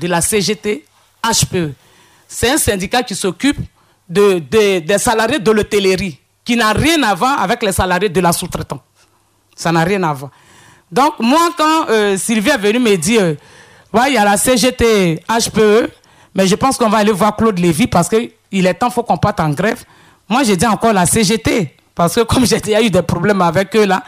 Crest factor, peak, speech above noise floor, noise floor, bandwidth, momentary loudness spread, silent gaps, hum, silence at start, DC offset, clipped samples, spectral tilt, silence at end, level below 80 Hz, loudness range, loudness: 12 dB; -2 dBFS; 42 dB; -55 dBFS; 16 kHz; 9 LU; none; none; 0 s; under 0.1%; under 0.1%; -4 dB/octave; 0.05 s; -38 dBFS; 3 LU; -14 LUFS